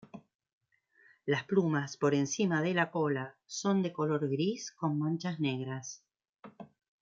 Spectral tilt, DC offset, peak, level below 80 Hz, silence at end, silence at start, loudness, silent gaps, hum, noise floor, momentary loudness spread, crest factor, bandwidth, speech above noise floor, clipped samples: -5.5 dB/octave; under 0.1%; -14 dBFS; -80 dBFS; 0.35 s; 0.15 s; -32 LUFS; 0.35-0.39 s, 0.53-0.61 s, 6.29-6.33 s; none; -68 dBFS; 12 LU; 20 dB; 7.8 kHz; 36 dB; under 0.1%